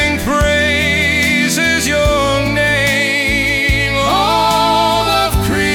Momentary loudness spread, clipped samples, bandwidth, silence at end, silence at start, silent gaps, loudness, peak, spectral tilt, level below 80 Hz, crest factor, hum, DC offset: 2 LU; under 0.1%; over 20 kHz; 0 s; 0 s; none; -12 LUFS; -4 dBFS; -3.5 dB/octave; -26 dBFS; 10 dB; none; under 0.1%